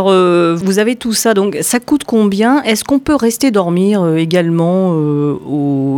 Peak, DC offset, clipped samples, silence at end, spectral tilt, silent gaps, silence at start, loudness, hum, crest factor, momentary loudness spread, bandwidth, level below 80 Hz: -2 dBFS; under 0.1%; under 0.1%; 0 s; -5.5 dB/octave; none; 0 s; -13 LUFS; none; 10 dB; 4 LU; 19 kHz; -46 dBFS